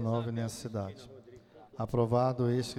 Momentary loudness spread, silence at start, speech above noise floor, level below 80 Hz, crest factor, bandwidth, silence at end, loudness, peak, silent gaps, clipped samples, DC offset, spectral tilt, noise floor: 22 LU; 0 s; 23 dB; -60 dBFS; 16 dB; 13.5 kHz; 0 s; -32 LUFS; -16 dBFS; none; under 0.1%; under 0.1%; -7 dB/octave; -55 dBFS